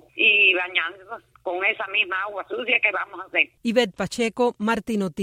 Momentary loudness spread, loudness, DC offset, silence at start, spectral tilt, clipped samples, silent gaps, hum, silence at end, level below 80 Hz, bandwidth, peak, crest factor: 13 LU; -21 LUFS; under 0.1%; 0.15 s; -4 dB/octave; under 0.1%; none; none; 0 s; -62 dBFS; 15.5 kHz; -4 dBFS; 18 dB